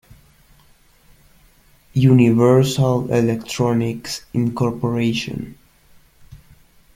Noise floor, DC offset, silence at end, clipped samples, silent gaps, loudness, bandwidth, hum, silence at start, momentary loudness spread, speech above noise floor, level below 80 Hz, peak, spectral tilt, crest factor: -53 dBFS; under 0.1%; 0.6 s; under 0.1%; none; -18 LUFS; 16 kHz; none; 1.95 s; 13 LU; 36 dB; -48 dBFS; -2 dBFS; -7 dB/octave; 18 dB